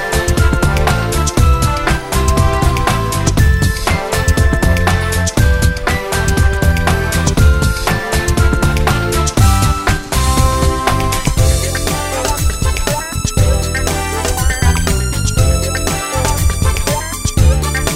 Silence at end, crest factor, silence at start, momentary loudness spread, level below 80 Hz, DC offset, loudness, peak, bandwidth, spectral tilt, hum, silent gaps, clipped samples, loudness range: 0 s; 12 dB; 0 s; 4 LU; -16 dBFS; under 0.1%; -14 LUFS; 0 dBFS; 16.5 kHz; -4.5 dB/octave; none; none; under 0.1%; 2 LU